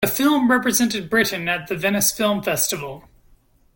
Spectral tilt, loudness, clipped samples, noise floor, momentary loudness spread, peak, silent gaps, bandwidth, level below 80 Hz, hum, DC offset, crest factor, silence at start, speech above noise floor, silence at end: -3 dB/octave; -19 LUFS; under 0.1%; -55 dBFS; 6 LU; -4 dBFS; none; 17 kHz; -52 dBFS; none; under 0.1%; 18 dB; 0 s; 35 dB; 0.75 s